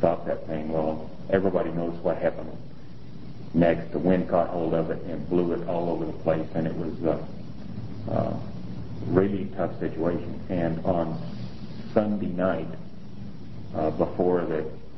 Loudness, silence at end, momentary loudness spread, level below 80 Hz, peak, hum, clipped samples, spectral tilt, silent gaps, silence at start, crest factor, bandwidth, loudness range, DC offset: -27 LUFS; 0 s; 16 LU; -48 dBFS; -4 dBFS; none; under 0.1%; -10 dB/octave; none; 0 s; 24 dB; 6 kHz; 3 LU; 2%